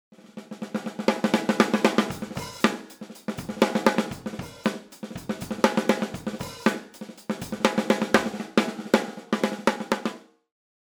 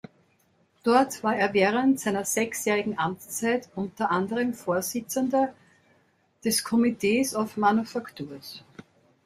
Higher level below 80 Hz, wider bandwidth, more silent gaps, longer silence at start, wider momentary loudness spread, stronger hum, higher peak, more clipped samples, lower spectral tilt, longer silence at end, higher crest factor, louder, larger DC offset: first, -60 dBFS vs -68 dBFS; first, over 20 kHz vs 16 kHz; neither; second, 0.35 s vs 0.85 s; first, 15 LU vs 12 LU; neither; first, 0 dBFS vs -8 dBFS; neither; about the same, -4.5 dB/octave vs -4 dB/octave; first, 0.75 s vs 0.45 s; first, 26 dB vs 20 dB; about the same, -26 LUFS vs -26 LUFS; neither